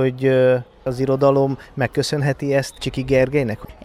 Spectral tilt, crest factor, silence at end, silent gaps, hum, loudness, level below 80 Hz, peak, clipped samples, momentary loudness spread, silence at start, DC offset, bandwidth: -6.5 dB/octave; 16 dB; 0.1 s; none; none; -19 LUFS; -44 dBFS; -4 dBFS; under 0.1%; 9 LU; 0 s; under 0.1%; 14.5 kHz